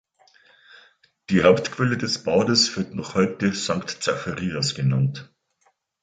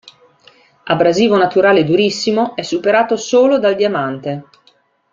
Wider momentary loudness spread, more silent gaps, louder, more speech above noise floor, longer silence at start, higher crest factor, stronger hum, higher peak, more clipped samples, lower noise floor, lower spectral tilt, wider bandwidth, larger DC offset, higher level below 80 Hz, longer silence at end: about the same, 9 LU vs 9 LU; neither; second, -22 LUFS vs -14 LUFS; about the same, 45 dB vs 42 dB; first, 1.3 s vs 0.85 s; first, 20 dB vs 14 dB; neither; second, -4 dBFS vs 0 dBFS; neither; first, -67 dBFS vs -55 dBFS; about the same, -4.5 dB/octave vs -5 dB/octave; first, 9.4 kHz vs 7.6 kHz; neither; about the same, -54 dBFS vs -58 dBFS; about the same, 0.8 s vs 0.7 s